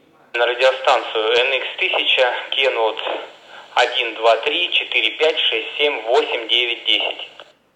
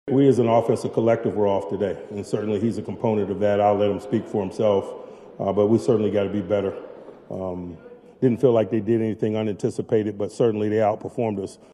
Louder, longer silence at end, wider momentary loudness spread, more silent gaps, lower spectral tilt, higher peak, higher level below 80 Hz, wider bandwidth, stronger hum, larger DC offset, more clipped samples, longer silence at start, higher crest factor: first, -17 LUFS vs -23 LUFS; first, 0.35 s vs 0.2 s; second, 8 LU vs 12 LU; neither; second, -0.5 dB/octave vs -8 dB/octave; about the same, -2 dBFS vs -4 dBFS; second, -74 dBFS vs -62 dBFS; second, 10 kHz vs 11.5 kHz; neither; neither; neither; first, 0.35 s vs 0.05 s; about the same, 18 dB vs 18 dB